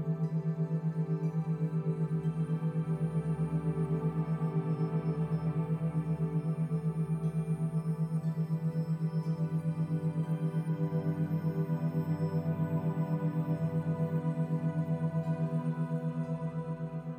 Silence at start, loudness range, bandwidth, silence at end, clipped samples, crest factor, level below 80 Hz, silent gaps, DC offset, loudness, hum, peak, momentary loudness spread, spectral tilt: 0 s; 1 LU; 5.4 kHz; 0 s; under 0.1%; 12 dB; -62 dBFS; none; under 0.1%; -33 LUFS; none; -20 dBFS; 1 LU; -10 dB/octave